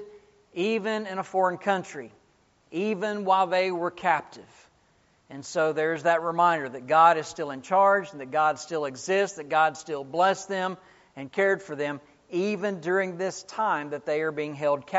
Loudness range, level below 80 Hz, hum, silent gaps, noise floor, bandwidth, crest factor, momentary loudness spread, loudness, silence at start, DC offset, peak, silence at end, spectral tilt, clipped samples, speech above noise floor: 5 LU; -74 dBFS; none; none; -64 dBFS; 8 kHz; 20 dB; 11 LU; -26 LUFS; 0 s; under 0.1%; -6 dBFS; 0 s; -3 dB/octave; under 0.1%; 38 dB